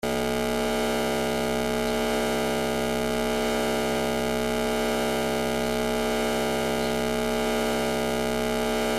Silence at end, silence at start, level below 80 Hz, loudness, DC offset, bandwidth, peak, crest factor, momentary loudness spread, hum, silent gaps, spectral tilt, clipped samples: 0 s; 0.05 s; -40 dBFS; -26 LUFS; under 0.1%; 16 kHz; -12 dBFS; 14 dB; 1 LU; none; none; -4 dB/octave; under 0.1%